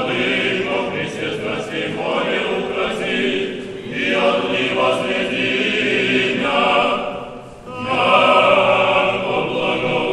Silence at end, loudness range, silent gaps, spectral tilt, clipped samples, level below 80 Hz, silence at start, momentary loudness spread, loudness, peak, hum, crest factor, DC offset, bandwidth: 0 s; 5 LU; none; -4.5 dB/octave; under 0.1%; -50 dBFS; 0 s; 10 LU; -17 LUFS; 0 dBFS; none; 18 dB; under 0.1%; 11.5 kHz